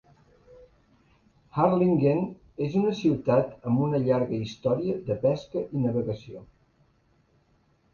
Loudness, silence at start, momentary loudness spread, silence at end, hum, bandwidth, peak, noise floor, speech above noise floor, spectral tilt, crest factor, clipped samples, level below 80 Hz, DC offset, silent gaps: -26 LUFS; 1.55 s; 11 LU; 1.5 s; none; 7.2 kHz; -8 dBFS; -66 dBFS; 40 dB; -9 dB/octave; 20 dB; under 0.1%; -58 dBFS; under 0.1%; none